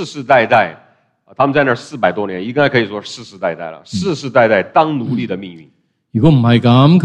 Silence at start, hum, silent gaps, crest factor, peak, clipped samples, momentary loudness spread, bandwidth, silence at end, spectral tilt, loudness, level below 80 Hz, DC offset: 0 s; none; none; 14 dB; 0 dBFS; under 0.1%; 13 LU; 9.4 kHz; 0 s; -7 dB/octave; -14 LUFS; -48 dBFS; under 0.1%